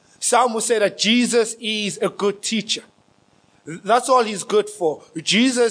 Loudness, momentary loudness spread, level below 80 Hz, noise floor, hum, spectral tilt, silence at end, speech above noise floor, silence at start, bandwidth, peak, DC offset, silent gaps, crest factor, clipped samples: -19 LUFS; 8 LU; -76 dBFS; -58 dBFS; none; -2.5 dB/octave; 0 s; 38 dB; 0.2 s; 10.5 kHz; -4 dBFS; under 0.1%; none; 16 dB; under 0.1%